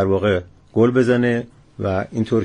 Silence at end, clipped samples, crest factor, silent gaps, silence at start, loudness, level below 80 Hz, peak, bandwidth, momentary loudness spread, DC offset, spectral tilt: 0 s; under 0.1%; 14 dB; none; 0 s; -19 LUFS; -50 dBFS; -4 dBFS; 10 kHz; 10 LU; under 0.1%; -8 dB/octave